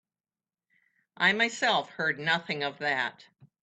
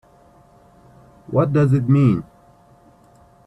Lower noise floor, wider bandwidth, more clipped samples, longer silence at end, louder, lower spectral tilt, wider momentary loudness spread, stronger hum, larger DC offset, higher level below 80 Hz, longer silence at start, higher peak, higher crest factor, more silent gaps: first, under -90 dBFS vs -51 dBFS; first, 9.2 kHz vs 8 kHz; neither; second, 0.15 s vs 1.25 s; second, -27 LUFS vs -18 LUFS; second, -3 dB/octave vs -10 dB/octave; about the same, 7 LU vs 7 LU; neither; neither; second, -78 dBFS vs -54 dBFS; about the same, 1.2 s vs 1.3 s; second, -10 dBFS vs -4 dBFS; about the same, 20 dB vs 16 dB; neither